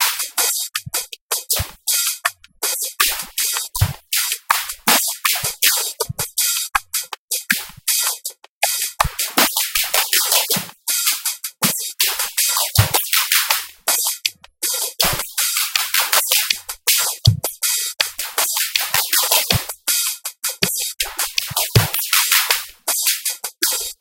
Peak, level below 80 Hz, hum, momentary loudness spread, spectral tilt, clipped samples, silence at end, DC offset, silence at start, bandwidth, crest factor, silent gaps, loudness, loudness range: 0 dBFS; -42 dBFS; none; 7 LU; -1 dB/octave; under 0.1%; 0.1 s; under 0.1%; 0 s; 17.5 kHz; 20 dB; 1.21-1.29 s, 7.18-7.28 s, 8.49-8.61 s; -17 LUFS; 2 LU